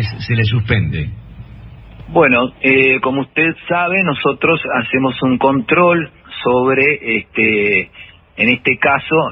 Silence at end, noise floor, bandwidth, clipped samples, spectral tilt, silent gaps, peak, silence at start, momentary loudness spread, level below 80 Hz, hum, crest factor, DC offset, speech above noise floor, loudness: 0 s; -35 dBFS; 5.8 kHz; under 0.1%; -9.5 dB/octave; none; 0 dBFS; 0 s; 7 LU; -40 dBFS; none; 14 dB; under 0.1%; 21 dB; -14 LUFS